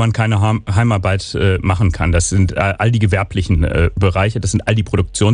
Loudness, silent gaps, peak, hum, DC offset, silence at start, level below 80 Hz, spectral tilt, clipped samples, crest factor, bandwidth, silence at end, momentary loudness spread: -16 LUFS; none; -2 dBFS; none; under 0.1%; 0 s; -26 dBFS; -6 dB/octave; under 0.1%; 12 dB; 10 kHz; 0 s; 2 LU